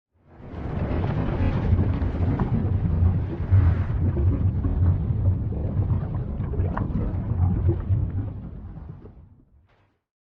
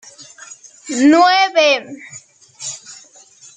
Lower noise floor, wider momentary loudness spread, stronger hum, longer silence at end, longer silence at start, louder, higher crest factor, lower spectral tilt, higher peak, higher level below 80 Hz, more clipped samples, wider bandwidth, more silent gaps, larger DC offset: first, -63 dBFS vs -45 dBFS; second, 12 LU vs 25 LU; neither; first, 1 s vs 0.6 s; first, 0.35 s vs 0.2 s; second, -25 LUFS vs -13 LUFS; about the same, 14 dB vs 16 dB; first, -11.5 dB/octave vs -1.5 dB/octave; second, -8 dBFS vs -2 dBFS; first, -32 dBFS vs -68 dBFS; neither; second, 3.9 kHz vs 9.4 kHz; neither; neither